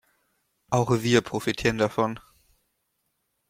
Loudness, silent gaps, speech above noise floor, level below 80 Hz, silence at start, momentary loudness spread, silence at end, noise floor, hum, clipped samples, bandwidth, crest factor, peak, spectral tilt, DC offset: -25 LUFS; none; 52 dB; -54 dBFS; 0.7 s; 7 LU; 1.3 s; -76 dBFS; none; under 0.1%; 16 kHz; 22 dB; -6 dBFS; -5.5 dB/octave; under 0.1%